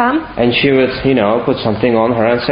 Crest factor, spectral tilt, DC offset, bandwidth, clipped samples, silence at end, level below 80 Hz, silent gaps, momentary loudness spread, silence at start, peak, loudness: 12 dB; -11.5 dB/octave; under 0.1%; 5.2 kHz; under 0.1%; 0 s; -40 dBFS; none; 4 LU; 0 s; 0 dBFS; -13 LUFS